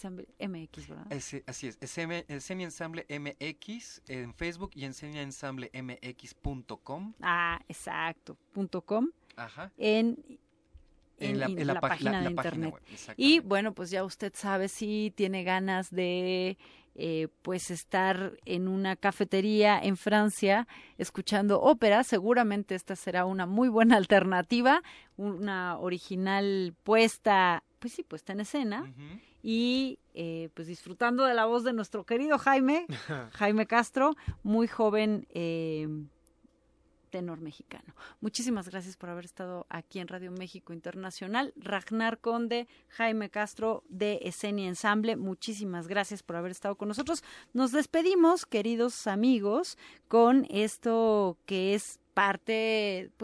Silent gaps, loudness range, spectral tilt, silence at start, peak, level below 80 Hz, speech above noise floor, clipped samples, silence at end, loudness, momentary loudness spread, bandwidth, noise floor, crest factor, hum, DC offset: none; 12 LU; -5 dB/octave; 0 s; -10 dBFS; -60 dBFS; 38 dB; under 0.1%; 0 s; -30 LUFS; 17 LU; 11 kHz; -68 dBFS; 20 dB; none; under 0.1%